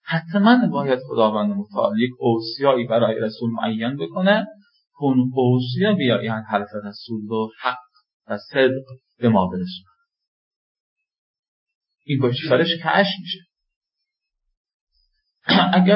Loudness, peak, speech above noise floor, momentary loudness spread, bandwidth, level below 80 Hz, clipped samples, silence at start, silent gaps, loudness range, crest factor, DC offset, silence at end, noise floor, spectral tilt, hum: -20 LUFS; -2 dBFS; 62 dB; 13 LU; 5.8 kHz; -60 dBFS; under 0.1%; 0.05 s; 8.14-8.20 s, 10.28-10.96 s, 11.18-11.66 s, 11.75-11.81 s, 13.76-13.81 s, 14.57-14.64 s, 14.74-14.87 s; 4 LU; 18 dB; under 0.1%; 0 s; -81 dBFS; -11 dB/octave; none